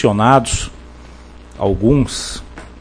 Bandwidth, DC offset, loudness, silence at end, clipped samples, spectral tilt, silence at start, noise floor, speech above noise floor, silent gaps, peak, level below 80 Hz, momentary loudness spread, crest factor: 10.5 kHz; under 0.1%; -16 LUFS; 0.05 s; under 0.1%; -5.5 dB/octave; 0 s; -37 dBFS; 23 dB; none; 0 dBFS; -32 dBFS; 18 LU; 16 dB